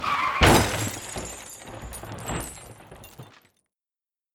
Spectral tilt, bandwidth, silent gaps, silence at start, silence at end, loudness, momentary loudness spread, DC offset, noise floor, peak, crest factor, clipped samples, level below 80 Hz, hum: -4 dB/octave; over 20 kHz; none; 0 s; 1.1 s; -23 LUFS; 27 LU; under 0.1%; under -90 dBFS; -2 dBFS; 24 dB; under 0.1%; -38 dBFS; none